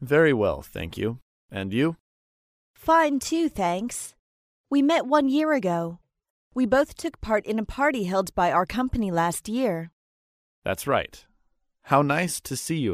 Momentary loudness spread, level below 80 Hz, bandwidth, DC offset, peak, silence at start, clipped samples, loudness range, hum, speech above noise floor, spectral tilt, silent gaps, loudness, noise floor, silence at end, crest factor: 14 LU; -48 dBFS; 15.5 kHz; under 0.1%; -6 dBFS; 0 s; under 0.1%; 3 LU; none; 45 dB; -5 dB/octave; 1.22-1.49 s, 2.00-2.74 s, 4.19-4.64 s, 6.30-6.51 s, 9.93-10.62 s; -25 LUFS; -69 dBFS; 0 s; 20 dB